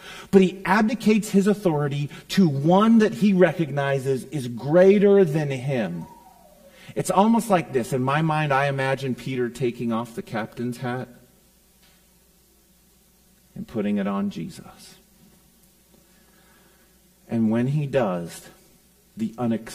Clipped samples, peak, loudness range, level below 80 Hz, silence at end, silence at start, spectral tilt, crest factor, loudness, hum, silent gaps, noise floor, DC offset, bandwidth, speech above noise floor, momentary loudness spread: under 0.1%; -2 dBFS; 14 LU; -58 dBFS; 0 s; 0 s; -7 dB/octave; 20 dB; -22 LUFS; none; none; -58 dBFS; under 0.1%; 15.5 kHz; 37 dB; 14 LU